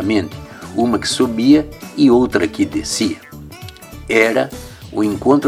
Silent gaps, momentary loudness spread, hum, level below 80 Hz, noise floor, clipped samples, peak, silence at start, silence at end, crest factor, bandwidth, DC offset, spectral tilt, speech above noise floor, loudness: none; 21 LU; none; -42 dBFS; -34 dBFS; under 0.1%; 0 dBFS; 0 s; 0 s; 16 dB; 16 kHz; under 0.1%; -4.5 dB/octave; 20 dB; -16 LUFS